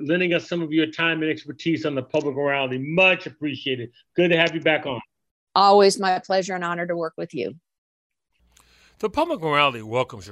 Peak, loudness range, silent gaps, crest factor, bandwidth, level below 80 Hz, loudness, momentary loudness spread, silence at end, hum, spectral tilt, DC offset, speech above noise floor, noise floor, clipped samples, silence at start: -2 dBFS; 7 LU; 5.31-5.47 s, 7.78-8.10 s; 20 dB; 12.5 kHz; -62 dBFS; -22 LUFS; 13 LU; 0 s; none; -5 dB/octave; under 0.1%; 40 dB; -62 dBFS; under 0.1%; 0 s